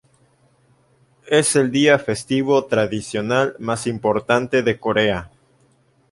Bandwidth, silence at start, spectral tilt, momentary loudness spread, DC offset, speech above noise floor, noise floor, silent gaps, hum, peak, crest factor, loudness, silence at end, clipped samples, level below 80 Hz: 11.5 kHz; 1.25 s; -4.5 dB/octave; 7 LU; under 0.1%; 40 dB; -59 dBFS; none; none; -2 dBFS; 18 dB; -19 LUFS; 0.85 s; under 0.1%; -52 dBFS